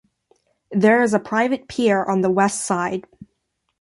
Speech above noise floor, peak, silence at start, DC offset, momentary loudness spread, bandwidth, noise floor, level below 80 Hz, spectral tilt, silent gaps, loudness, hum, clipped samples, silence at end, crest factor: 54 dB; -2 dBFS; 0.7 s; under 0.1%; 9 LU; 11.5 kHz; -73 dBFS; -62 dBFS; -5 dB/octave; none; -19 LUFS; none; under 0.1%; 0.8 s; 18 dB